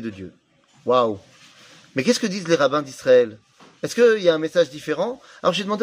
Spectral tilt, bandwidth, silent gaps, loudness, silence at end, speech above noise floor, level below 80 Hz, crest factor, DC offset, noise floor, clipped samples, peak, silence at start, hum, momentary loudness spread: -4.5 dB/octave; 15.5 kHz; none; -20 LUFS; 0 s; 29 dB; -68 dBFS; 18 dB; under 0.1%; -49 dBFS; under 0.1%; -4 dBFS; 0 s; none; 15 LU